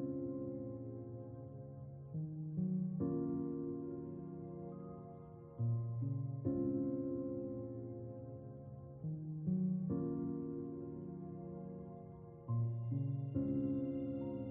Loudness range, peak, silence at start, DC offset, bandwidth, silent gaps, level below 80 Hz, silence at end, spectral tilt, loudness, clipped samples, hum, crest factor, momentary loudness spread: 2 LU; -24 dBFS; 0 s; under 0.1%; 3 kHz; none; -68 dBFS; 0 s; -13.5 dB/octave; -42 LUFS; under 0.1%; none; 16 dB; 13 LU